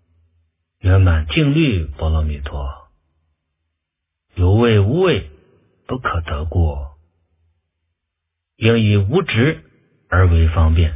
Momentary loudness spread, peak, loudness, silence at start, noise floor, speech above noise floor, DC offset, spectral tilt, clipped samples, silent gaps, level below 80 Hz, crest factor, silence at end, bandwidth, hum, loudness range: 14 LU; 0 dBFS; -17 LUFS; 0.85 s; -79 dBFS; 64 dB; under 0.1%; -11.5 dB/octave; under 0.1%; none; -24 dBFS; 18 dB; 0 s; 3.8 kHz; none; 5 LU